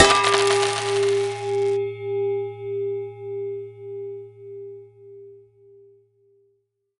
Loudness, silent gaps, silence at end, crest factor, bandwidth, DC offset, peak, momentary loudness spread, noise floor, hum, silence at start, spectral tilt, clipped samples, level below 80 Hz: -23 LUFS; none; 1.6 s; 24 dB; 11.5 kHz; under 0.1%; 0 dBFS; 22 LU; -70 dBFS; none; 0 s; -3 dB/octave; under 0.1%; -54 dBFS